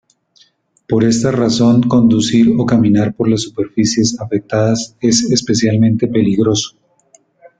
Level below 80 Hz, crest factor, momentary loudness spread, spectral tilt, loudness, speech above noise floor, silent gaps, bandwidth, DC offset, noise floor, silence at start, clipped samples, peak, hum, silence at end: -46 dBFS; 12 dB; 6 LU; -5.5 dB/octave; -13 LUFS; 41 dB; none; 9.2 kHz; under 0.1%; -54 dBFS; 0.9 s; under 0.1%; -2 dBFS; none; 0.9 s